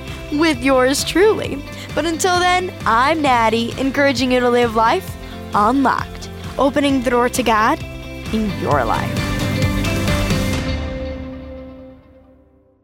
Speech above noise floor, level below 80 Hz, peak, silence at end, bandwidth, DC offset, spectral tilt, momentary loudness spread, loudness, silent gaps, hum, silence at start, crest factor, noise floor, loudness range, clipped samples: 36 dB; -32 dBFS; -2 dBFS; 0.85 s; 16.5 kHz; under 0.1%; -5 dB/octave; 14 LU; -17 LUFS; none; none; 0 s; 16 dB; -52 dBFS; 5 LU; under 0.1%